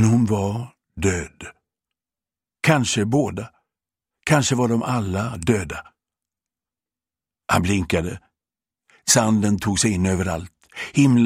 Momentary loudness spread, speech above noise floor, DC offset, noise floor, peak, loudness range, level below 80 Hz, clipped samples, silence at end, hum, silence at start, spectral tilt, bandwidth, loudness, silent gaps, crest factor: 18 LU; over 70 dB; under 0.1%; under -90 dBFS; -2 dBFS; 5 LU; -46 dBFS; under 0.1%; 0 s; none; 0 s; -5 dB/octave; 16 kHz; -21 LUFS; none; 20 dB